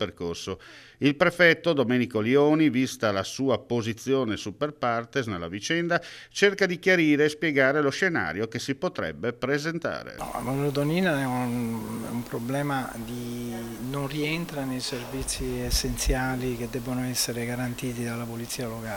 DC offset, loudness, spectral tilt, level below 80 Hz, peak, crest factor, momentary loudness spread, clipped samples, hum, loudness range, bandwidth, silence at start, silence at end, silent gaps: under 0.1%; -26 LUFS; -4.5 dB/octave; -44 dBFS; -6 dBFS; 22 dB; 11 LU; under 0.1%; none; 7 LU; 17.5 kHz; 0 s; 0 s; none